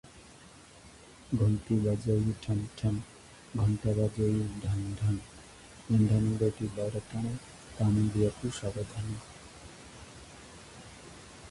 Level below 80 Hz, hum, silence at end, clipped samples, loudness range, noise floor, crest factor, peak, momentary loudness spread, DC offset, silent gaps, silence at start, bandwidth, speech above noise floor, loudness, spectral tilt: -50 dBFS; none; 0 s; under 0.1%; 4 LU; -54 dBFS; 16 dB; -16 dBFS; 22 LU; under 0.1%; none; 0.05 s; 11.5 kHz; 24 dB; -31 LUFS; -7.5 dB/octave